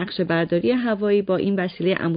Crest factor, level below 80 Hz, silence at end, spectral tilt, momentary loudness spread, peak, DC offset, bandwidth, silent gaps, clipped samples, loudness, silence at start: 12 dB; -58 dBFS; 0 s; -11.5 dB/octave; 2 LU; -8 dBFS; under 0.1%; 5.2 kHz; none; under 0.1%; -21 LUFS; 0 s